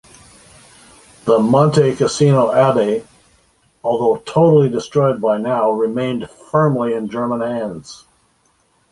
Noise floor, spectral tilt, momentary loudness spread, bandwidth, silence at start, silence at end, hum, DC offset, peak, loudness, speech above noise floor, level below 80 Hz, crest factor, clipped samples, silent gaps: -59 dBFS; -7 dB/octave; 12 LU; 11.5 kHz; 1.25 s; 0.95 s; none; under 0.1%; -2 dBFS; -16 LUFS; 44 dB; -54 dBFS; 16 dB; under 0.1%; none